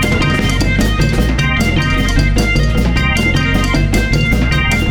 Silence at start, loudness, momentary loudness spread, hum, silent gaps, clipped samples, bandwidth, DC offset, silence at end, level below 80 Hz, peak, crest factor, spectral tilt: 0 s; -13 LUFS; 1 LU; none; none; under 0.1%; 18.5 kHz; under 0.1%; 0 s; -16 dBFS; -2 dBFS; 12 dB; -5.5 dB/octave